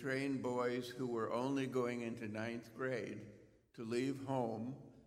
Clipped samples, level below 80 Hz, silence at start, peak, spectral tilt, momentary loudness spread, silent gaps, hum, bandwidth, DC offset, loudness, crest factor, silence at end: under 0.1%; -76 dBFS; 0 s; -24 dBFS; -6 dB/octave; 10 LU; none; none; 15 kHz; under 0.1%; -41 LUFS; 16 dB; 0.05 s